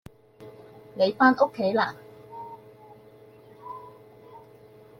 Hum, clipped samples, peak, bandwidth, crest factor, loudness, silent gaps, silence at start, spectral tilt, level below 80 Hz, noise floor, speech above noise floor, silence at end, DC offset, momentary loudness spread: none; under 0.1%; -6 dBFS; 14 kHz; 22 dB; -23 LUFS; none; 0.4 s; -6.5 dB/octave; -70 dBFS; -51 dBFS; 29 dB; 0.6 s; under 0.1%; 27 LU